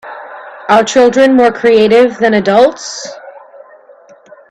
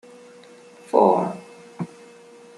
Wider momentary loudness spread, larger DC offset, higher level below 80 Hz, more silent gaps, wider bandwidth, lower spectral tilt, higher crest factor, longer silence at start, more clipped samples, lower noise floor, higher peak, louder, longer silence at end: about the same, 19 LU vs 20 LU; neither; first, -52 dBFS vs -74 dBFS; neither; second, 10.5 kHz vs 12 kHz; second, -4.5 dB/octave vs -7.5 dB/octave; second, 12 dB vs 22 dB; second, 0.05 s vs 0.95 s; neither; second, -41 dBFS vs -47 dBFS; about the same, 0 dBFS vs -2 dBFS; first, -9 LUFS vs -20 LUFS; first, 1.1 s vs 0.7 s